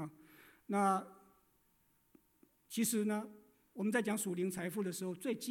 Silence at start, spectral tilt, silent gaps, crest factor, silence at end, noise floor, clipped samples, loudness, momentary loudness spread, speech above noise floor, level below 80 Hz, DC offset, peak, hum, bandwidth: 0 s; -4.5 dB/octave; none; 18 dB; 0 s; -75 dBFS; under 0.1%; -37 LUFS; 14 LU; 38 dB; -82 dBFS; under 0.1%; -22 dBFS; none; 18 kHz